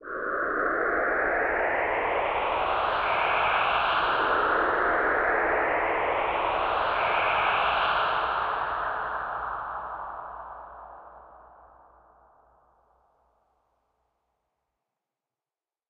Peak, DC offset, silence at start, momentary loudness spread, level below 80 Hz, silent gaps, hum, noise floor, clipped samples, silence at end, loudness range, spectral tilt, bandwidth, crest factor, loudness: -12 dBFS; under 0.1%; 0 s; 12 LU; -52 dBFS; none; none; under -90 dBFS; under 0.1%; 4.45 s; 14 LU; -6 dB/octave; 6.2 kHz; 16 dB; -25 LUFS